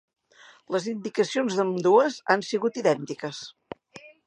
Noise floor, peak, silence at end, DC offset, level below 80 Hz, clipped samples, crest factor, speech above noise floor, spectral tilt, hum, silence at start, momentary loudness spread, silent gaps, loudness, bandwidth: -55 dBFS; -4 dBFS; 0.2 s; under 0.1%; -76 dBFS; under 0.1%; 22 dB; 30 dB; -5 dB/octave; none; 0.7 s; 20 LU; none; -25 LUFS; 10.5 kHz